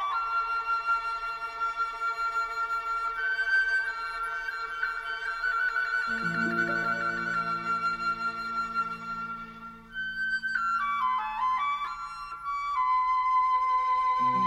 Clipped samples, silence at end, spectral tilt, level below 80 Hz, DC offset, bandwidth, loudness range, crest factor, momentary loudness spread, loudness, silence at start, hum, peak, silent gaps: under 0.1%; 0 s; -3.5 dB/octave; -58 dBFS; under 0.1%; 13 kHz; 3 LU; 12 dB; 9 LU; -29 LUFS; 0 s; none; -16 dBFS; none